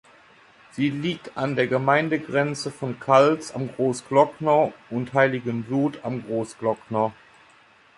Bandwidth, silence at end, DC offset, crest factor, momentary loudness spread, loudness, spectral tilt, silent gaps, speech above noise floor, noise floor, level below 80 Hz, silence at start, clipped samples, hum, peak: 11.5 kHz; 0.85 s; under 0.1%; 20 dB; 10 LU; -23 LUFS; -6 dB/octave; none; 32 dB; -55 dBFS; -64 dBFS; 0.75 s; under 0.1%; none; -4 dBFS